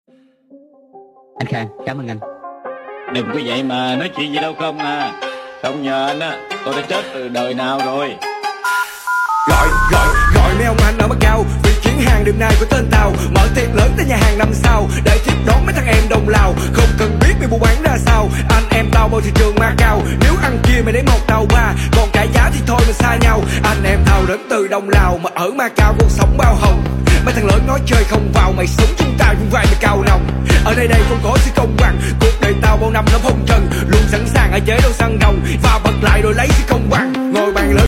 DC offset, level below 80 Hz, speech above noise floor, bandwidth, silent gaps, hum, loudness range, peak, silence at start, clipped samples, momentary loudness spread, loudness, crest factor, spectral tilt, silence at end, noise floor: under 0.1%; -16 dBFS; 36 dB; 16.5 kHz; none; none; 7 LU; 0 dBFS; 0.95 s; under 0.1%; 9 LU; -14 LUFS; 12 dB; -5.5 dB/octave; 0 s; -48 dBFS